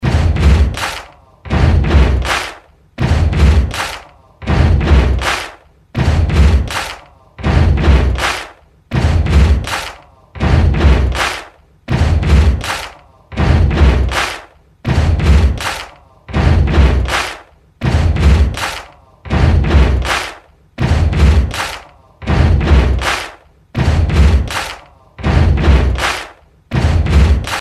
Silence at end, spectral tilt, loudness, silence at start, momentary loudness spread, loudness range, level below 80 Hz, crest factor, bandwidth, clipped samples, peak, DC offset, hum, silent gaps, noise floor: 0 s; -6 dB/octave; -14 LUFS; 0 s; 13 LU; 0 LU; -16 dBFS; 12 dB; 13 kHz; under 0.1%; 0 dBFS; under 0.1%; none; none; -37 dBFS